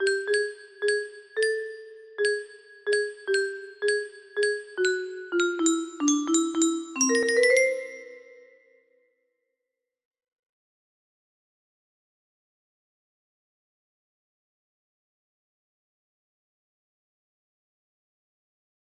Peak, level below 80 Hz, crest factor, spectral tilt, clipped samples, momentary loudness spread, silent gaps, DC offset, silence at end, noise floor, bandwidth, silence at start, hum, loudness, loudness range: -10 dBFS; -78 dBFS; 20 dB; -0.5 dB/octave; under 0.1%; 13 LU; none; under 0.1%; 10.65 s; -86 dBFS; 13 kHz; 0 s; none; -26 LUFS; 5 LU